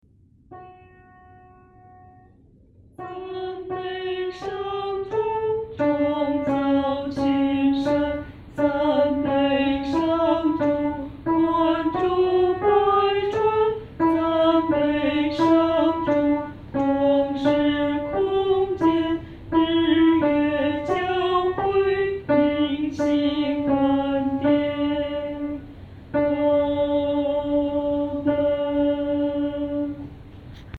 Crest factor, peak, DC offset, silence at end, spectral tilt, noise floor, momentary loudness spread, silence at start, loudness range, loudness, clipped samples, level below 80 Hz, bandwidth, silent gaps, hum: 14 dB; -8 dBFS; under 0.1%; 0 s; -7.5 dB/octave; -53 dBFS; 10 LU; 0.5 s; 6 LU; -22 LUFS; under 0.1%; -48 dBFS; 7 kHz; none; none